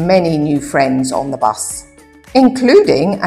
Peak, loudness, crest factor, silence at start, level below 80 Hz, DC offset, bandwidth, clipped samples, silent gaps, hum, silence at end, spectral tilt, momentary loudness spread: 0 dBFS; -13 LUFS; 12 dB; 0 s; -44 dBFS; under 0.1%; 14.5 kHz; under 0.1%; none; none; 0 s; -5.5 dB/octave; 10 LU